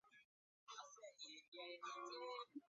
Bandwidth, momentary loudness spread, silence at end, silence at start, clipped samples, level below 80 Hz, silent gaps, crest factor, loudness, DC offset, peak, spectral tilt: 7.4 kHz; 7 LU; 0.05 s; 0.05 s; under 0.1%; under -90 dBFS; 0.25-0.67 s, 1.48-1.52 s; 16 dB; -55 LUFS; under 0.1%; -40 dBFS; 1.5 dB/octave